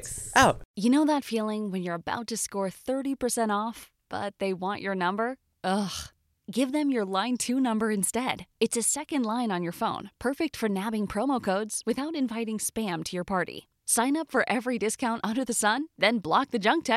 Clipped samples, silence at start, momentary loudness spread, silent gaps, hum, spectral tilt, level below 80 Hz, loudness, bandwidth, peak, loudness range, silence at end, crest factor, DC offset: under 0.1%; 0 s; 8 LU; 0.65-0.74 s; none; -3.5 dB/octave; -58 dBFS; -28 LUFS; 16 kHz; -6 dBFS; 4 LU; 0 s; 22 dB; under 0.1%